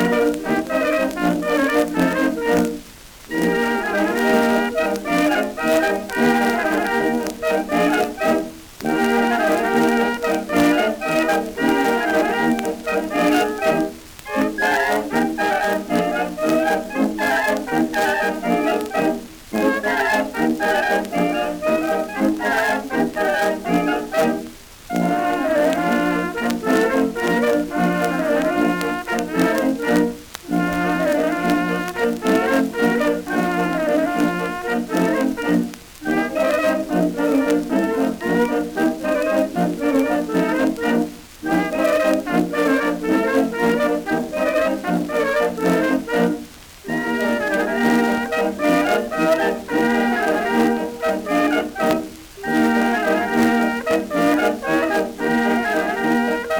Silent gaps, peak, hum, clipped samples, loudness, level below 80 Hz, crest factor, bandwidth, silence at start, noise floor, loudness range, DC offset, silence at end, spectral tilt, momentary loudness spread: none; -4 dBFS; none; under 0.1%; -19 LUFS; -48 dBFS; 16 dB; over 20 kHz; 0 s; -41 dBFS; 2 LU; under 0.1%; 0 s; -5 dB/octave; 5 LU